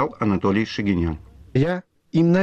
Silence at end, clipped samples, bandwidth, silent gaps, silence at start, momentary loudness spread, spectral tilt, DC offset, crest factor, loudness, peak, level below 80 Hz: 0 s; under 0.1%; 7.2 kHz; none; 0 s; 7 LU; -8 dB/octave; under 0.1%; 14 dB; -22 LUFS; -8 dBFS; -42 dBFS